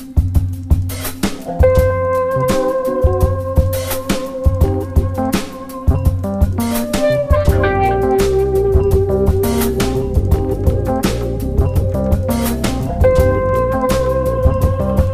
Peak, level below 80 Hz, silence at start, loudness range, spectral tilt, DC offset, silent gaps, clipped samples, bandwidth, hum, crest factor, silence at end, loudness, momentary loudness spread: 0 dBFS; -20 dBFS; 0 s; 3 LU; -6.5 dB/octave; under 0.1%; none; under 0.1%; 15.5 kHz; none; 14 dB; 0 s; -16 LUFS; 5 LU